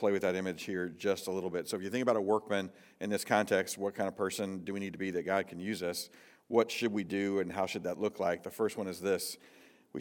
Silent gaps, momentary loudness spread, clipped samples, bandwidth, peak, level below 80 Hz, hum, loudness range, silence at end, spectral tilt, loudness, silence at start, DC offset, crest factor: none; 7 LU; under 0.1%; 18 kHz; -12 dBFS; -82 dBFS; none; 2 LU; 0 s; -4.5 dB/octave; -34 LUFS; 0 s; under 0.1%; 22 dB